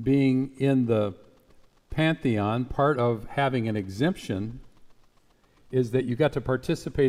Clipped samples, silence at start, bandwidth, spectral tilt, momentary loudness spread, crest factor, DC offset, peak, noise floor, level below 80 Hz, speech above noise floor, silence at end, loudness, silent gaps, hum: under 0.1%; 0 s; 13.5 kHz; -7.5 dB/octave; 8 LU; 16 dB; under 0.1%; -10 dBFS; -61 dBFS; -50 dBFS; 36 dB; 0 s; -26 LUFS; none; none